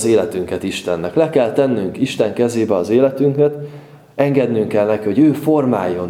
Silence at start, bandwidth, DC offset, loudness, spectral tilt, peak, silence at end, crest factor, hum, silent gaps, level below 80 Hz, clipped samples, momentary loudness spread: 0 s; 16 kHz; under 0.1%; -16 LUFS; -6.5 dB/octave; 0 dBFS; 0 s; 16 dB; none; none; -56 dBFS; under 0.1%; 8 LU